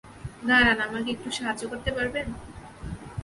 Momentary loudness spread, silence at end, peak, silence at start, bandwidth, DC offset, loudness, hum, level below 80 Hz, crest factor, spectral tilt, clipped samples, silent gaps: 22 LU; 0 s; -8 dBFS; 0.05 s; 11.5 kHz; under 0.1%; -25 LUFS; none; -44 dBFS; 20 dB; -4 dB/octave; under 0.1%; none